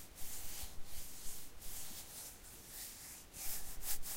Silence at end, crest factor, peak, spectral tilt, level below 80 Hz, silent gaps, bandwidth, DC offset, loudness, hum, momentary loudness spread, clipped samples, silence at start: 0 s; 18 dB; -24 dBFS; -1 dB/octave; -54 dBFS; none; 16 kHz; under 0.1%; -47 LUFS; none; 7 LU; under 0.1%; 0 s